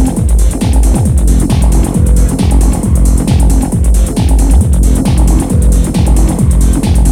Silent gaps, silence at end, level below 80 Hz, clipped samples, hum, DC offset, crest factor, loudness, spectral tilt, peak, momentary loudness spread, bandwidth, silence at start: none; 0 s; -10 dBFS; under 0.1%; none; under 0.1%; 8 dB; -10 LUFS; -6.5 dB/octave; 0 dBFS; 2 LU; 14.5 kHz; 0 s